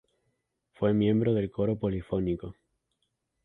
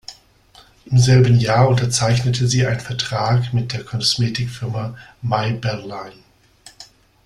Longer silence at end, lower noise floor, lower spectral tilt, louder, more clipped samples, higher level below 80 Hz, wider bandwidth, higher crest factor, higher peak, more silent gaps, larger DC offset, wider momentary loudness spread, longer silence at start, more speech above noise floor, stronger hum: first, 0.9 s vs 0.4 s; first, -79 dBFS vs -50 dBFS; first, -10.5 dB/octave vs -5 dB/octave; second, -28 LUFS vs -18 LUFS; neither; second, -52 dBFS vs -46 dBFS; second, 4 kHz vs 12 kHz; about the same, 16 dB vs 16 dB; second, -14 dBFS vs -2 dBFS; neither; neither; second, 8 LU vs 16 LU; first, 0.8 s vs 0.1 s; first, 52 dB vs 32 dB; neither